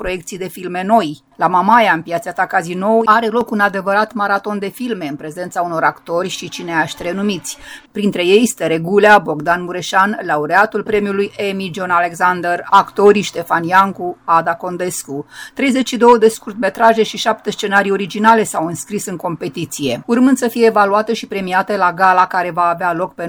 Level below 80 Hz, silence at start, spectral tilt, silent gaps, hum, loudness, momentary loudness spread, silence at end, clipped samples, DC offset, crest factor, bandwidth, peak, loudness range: -52 dBFS; 0 s; -4.5 dB/octave; none; none; -15 LUFS; 11 LU; 0 s; under 0.1%; under 0.1%; 14 dB; over 20 kHz; 0 dBFS; 4 LU